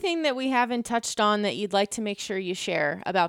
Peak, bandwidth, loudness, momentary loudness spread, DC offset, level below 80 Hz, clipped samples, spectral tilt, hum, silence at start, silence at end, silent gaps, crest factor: -10 dBFS; 17 kHz; -26 LUFS; 6 LU; under 0.1%; -66 dBFS; under 0.1%; -3.5 dB/octave; none; 0 s; 0 s; none; 16 dB